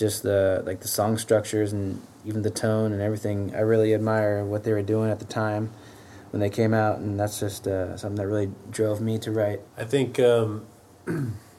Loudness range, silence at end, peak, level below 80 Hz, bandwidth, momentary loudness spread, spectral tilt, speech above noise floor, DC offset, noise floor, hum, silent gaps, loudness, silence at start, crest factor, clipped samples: 3 LU; 0.15 s; -8 dBFS; -62 dBFS; 15.5 kHz; 9 LU; -6 dB/octave; 21 dB; under 0.1%; -46 dBFS; none; none; -25 LUFS; 0 s; 16 dB; under 0.1%